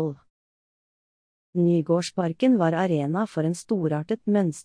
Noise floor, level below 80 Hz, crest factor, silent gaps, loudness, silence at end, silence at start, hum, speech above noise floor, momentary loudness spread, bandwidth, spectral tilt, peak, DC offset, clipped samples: under -90 dBFS; -70 dBFS; 14 dB; 0.30-1.53 s; -24 LUFS; 0 s; 0 s; none; over 67 dB; 6 LU; 10.5 kHz; -7 dB/octave; -10 dBFS; under 0.1%; under 0.1%